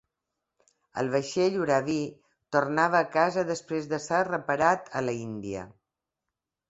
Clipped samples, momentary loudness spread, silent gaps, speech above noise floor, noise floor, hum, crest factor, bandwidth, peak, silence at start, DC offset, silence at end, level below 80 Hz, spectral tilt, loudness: under 0.1%; 12 LU; none; 60 dB; -87 dBFS; none; 20 dB; 8.2 kHz; -8 dBFS; 0.95 s; under 0.1%; 1 s; -66 dBFS; -5 dB/octave; -27 LUFS